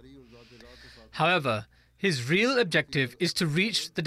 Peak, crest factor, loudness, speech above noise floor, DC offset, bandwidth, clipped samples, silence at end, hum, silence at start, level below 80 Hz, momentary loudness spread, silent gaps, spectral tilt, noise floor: -12 dBFS; 16 dB; -26 LUFS; 24 dB; under 0.1%; 15 kHz; under 0.1%; 0 s; none; 0.05 s; -62 dBFS; 7 LU; none; -4.5 dB/octave; -51 dBFS